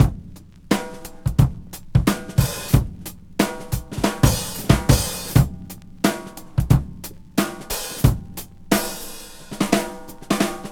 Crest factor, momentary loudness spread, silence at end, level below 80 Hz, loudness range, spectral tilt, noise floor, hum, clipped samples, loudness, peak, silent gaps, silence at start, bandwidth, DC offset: 22 dB; 16 LU; 0 s; -30 dBFS; 3 LU; -5.5 dB/octave; -41 dBFS; none; under 0.1%; -22 LUFS; 0 dBFS; none; 0 s; over 20 kHz; under 0.1%